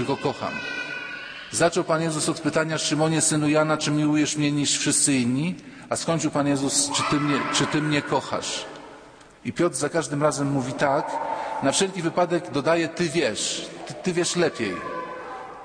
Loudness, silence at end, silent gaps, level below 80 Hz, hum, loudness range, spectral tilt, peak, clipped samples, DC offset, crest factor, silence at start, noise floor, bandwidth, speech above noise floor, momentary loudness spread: -23 LUFS; 0 s; none; -60 dBFS; none; 4 LU; -4 dB/octave; -8 dBFS; under 0.1%; under 0.1%; 18 dB; 0 s; -47 dBFS; 10.5 kHz; 24 dB; 11 LU